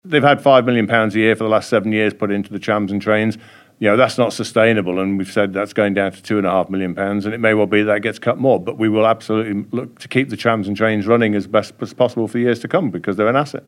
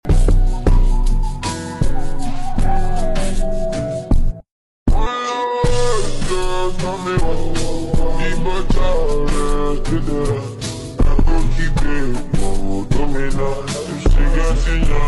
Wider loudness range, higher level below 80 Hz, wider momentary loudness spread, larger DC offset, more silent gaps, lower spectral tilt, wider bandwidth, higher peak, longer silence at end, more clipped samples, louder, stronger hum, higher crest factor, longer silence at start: about the same, 2 LU vs 2 LU; second, -64 dBFS vs -16 dBFS; about the same, 6 LU vs 6 LU; neither; second, none vs 4.52-4.86 s; about the same, -6.5 dB/octave vs -6 dB/octave; first, 13 kHz vs 11.5 kHz; first, 0 dBFS vs -6 dBFS; about the same, 0.1 s vs 0 s; neither; first, -17 LUFS vs -21 LUFS; neither; first, 16 dB vs 8 dB; about the same, 0.05 s vs 0.05 s